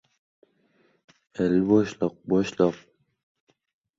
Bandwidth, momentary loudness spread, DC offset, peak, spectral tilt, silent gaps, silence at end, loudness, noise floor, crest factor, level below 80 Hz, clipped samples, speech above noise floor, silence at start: 7.8 kHz; 13 LU; under 0.1%; -6 dBFS; -7.5 dB/octave; none; 1.2 s; -24 LUFS; -66 dBFS; 20 dB; -60 dBFS; under 0.1%; 43 dB; 1.4 s